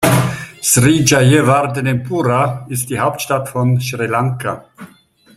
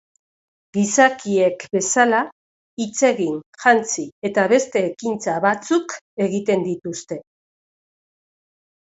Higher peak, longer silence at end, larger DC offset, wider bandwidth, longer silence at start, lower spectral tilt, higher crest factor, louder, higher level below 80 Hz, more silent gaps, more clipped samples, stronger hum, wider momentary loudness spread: about the same, 0 dBFS vs 0 dBFS; second, 0.5 s vs 1.65 s; neither; first, 15.5 kHz vs 8.2 kHz; second, 0 s vs 0.75 s; about the same, -5 dB/octave vs -4 dB/octave; second, 14 dB vs 20 dB; first, -15 LUFS vs -19 LUFS; first, -46 dBFS vs -66 dBFS; second, none vs 2.32-2.77 s, 3.46-3.53 s, 4.12-4.22 s, 6.01-6.17 s; neither; neither; second, 10 LU vs 13 LU